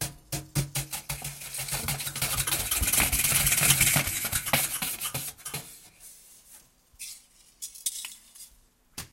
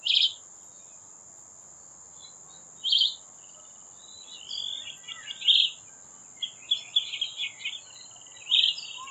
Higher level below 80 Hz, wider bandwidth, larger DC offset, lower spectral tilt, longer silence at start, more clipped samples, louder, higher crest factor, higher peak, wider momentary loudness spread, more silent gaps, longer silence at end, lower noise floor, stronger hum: first, -46 dBFS vs -80 dBFS; first, 17 kHz vs 9.2 kHz; neither; first, -1.5 dB/octave vs 2.5 dB/octave; about the same, 0 s vs 0 s; neither; about the same, -26 LUFS vs -25 LUFS; about the same, 24 dB vs 24 dB; about the same, -6 dBFS vs -8 dBFS; second, 22 LU vs 25 LU; neither; about the same, 0.05 s vs 0 s; first, -61 dBFS vs -50 dBFS; neither